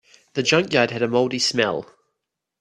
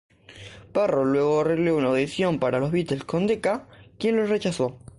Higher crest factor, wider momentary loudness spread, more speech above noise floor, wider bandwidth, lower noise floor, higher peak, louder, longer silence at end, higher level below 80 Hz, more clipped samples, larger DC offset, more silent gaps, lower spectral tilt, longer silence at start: first, 22 dB vs 14 dB; about the same, 8 LU vs 7 LU; first, 60 dB vs 22 dB; about the same, 12 kHz vs 11.5 kHz; first, -81 dBFS vs -45 dBFS; first, -2 dBFS vs -10 dBFS; first, -20 LUFS vs -24 LUFS; first, 0.75 s vs 0.2 s; second, -64 dBFS vs -56 dBFS; neither; neither; neither; second, -3.5 dB/octave vs -6.5 dB/octave; about the same, 0.35 s vs 0.3 s